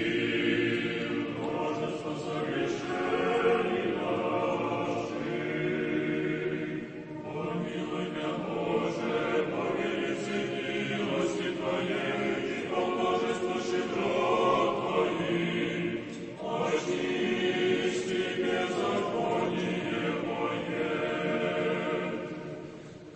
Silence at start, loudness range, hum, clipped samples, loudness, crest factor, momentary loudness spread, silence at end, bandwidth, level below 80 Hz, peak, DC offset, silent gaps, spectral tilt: 0 s; 3 LU; none; under 0.1%; -30 LUFS; 16 dB; 7 LU; 0 s; 8.6 kHz; -64 dBFS; -14 dBFS; under 0.1%; none; -5.5 dB/octave